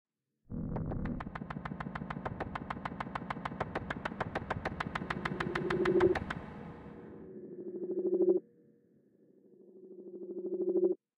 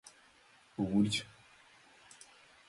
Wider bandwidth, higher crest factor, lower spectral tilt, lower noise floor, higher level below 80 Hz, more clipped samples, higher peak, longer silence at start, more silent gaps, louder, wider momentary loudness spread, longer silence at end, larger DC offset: second, 9.4 kHz vs 11.5 kHz; about the same, 20 dB vs 20 dB; first, -7.5 dB/octave vs -5 dB/octave; about the same, -67 dBFS vs -64 dBFS; first, -54 dBFS vs -66 dBFS; neither; first, -16 dBFS vs -20 dBFS; first, 0.5 s vs 0.05 s; neither; second, -36 LUFS vs -33 LUFS; second, 18 LU vs 26 LU; second, 0.2 s vs 1.45 s; neither